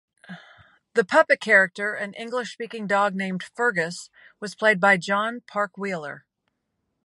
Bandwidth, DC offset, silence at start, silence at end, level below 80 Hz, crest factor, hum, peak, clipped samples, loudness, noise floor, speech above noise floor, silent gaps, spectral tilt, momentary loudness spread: 11.5 kHz; under 0.1%; 0.3 s; 0.85 s; -74 dBFS; 22 dB; none; -2 dBFS; under 0.1%; -23 LUFS; -77 dBFS; 54 dB; none; -4.5 dB/octave; 20 LU